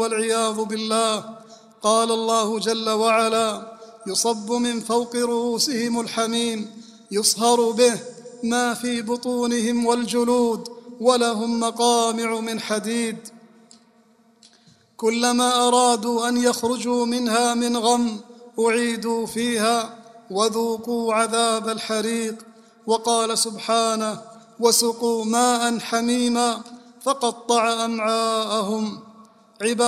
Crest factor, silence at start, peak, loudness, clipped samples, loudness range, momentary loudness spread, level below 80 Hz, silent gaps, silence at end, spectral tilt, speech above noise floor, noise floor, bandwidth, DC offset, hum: 20 dB; 0 s; -2 dBFS; -21 LUFS; under 0.1%; 3 LU; 10 LU; -66 dBFS; none; 0 s; -2.5 dB/octave; 36 dB; -57 dBFS; 15.5 kHz; under 0.1%; none